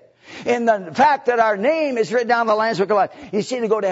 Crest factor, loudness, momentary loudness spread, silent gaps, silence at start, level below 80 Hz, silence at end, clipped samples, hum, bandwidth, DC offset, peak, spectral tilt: 16 dB; -19 LUFS; 6 LU; none; 0.3 s; -66 dBFS; 0 s; under 0.1%; none; 8 kHz; under 0.1%; -4 dBFS; -5 dB/octave